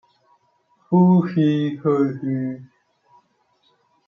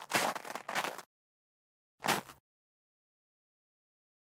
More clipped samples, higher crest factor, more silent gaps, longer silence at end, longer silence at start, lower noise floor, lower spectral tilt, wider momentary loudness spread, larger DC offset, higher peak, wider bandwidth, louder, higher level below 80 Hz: neither; second, 16 dB vs 26 dB; second, none vs 1.06-1.98 s; second, 1.45 s vs 2.05 s; first, 0.9 s vs 0 s; second, -64 dBFS vs under -90 dBFS; first, -10 dB/octave vs -2 dB/octave; about the same, 11 LU vs 13 LU; neither; first, -6 dBFS vs -14 dBFS; second, 5 kHz vs 17 kHz; first, -19 LUFS vs -36 LUFS; first, -68 dBFS vs -82 dBFS